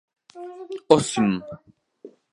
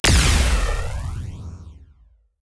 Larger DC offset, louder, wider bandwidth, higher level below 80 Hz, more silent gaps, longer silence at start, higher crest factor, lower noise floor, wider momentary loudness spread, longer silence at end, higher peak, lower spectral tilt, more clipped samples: neither; about the same, -21 LUFS vs -21 LUFS; about the same, 11.5 kHz vs 11 kHz; second, -60 dBFS vs -24 dBFS; neither; first, 0.35 s vs 0.05 s; first, 24 dB vs 16 dB; second, -49 dBFS vs -55 dBFS; about the same, 22 LU vs 21 LU; second, 0.25 s vs 0.65 s; first, 0 dBFS vs -6 dBFS; first, -5 dB/octave vs -3.5 dB/octave; neither